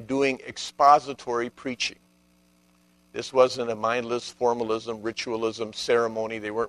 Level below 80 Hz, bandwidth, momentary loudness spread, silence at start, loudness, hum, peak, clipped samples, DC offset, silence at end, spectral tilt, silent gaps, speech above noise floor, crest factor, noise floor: -64 dBFS; 12 kHz; 11 LU; 0 s; -25 LUFS; 60 Hz at -60 dBFS; -4 dBFS; under 0.1%; under 0.1%; 0 s; -3.5 dB/octave; none; 37 dB; 22 dB; -62 dBFS